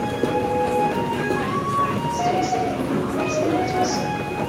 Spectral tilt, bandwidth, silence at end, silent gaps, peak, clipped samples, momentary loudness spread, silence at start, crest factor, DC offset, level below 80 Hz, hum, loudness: -5.5 dB/octave; 16 kHz; 0 s; none; -8 dBFS; under 0.1%; 2 LU; 0 s; 14 dB; under 0.1%; -46 dBFS; none; -22 LUFS